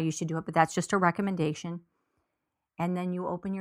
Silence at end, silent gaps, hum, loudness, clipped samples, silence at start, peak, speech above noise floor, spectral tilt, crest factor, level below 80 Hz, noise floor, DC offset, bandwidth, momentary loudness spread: 0 s; none; none; -29 LUFS; under 0.1%; 0 s; -6 dBFS; 55 dB; -6 dB/octave; 24 dB; -66 dBFS; -84 dBFS; under 0.1%; 14.5 kHz; 10 LU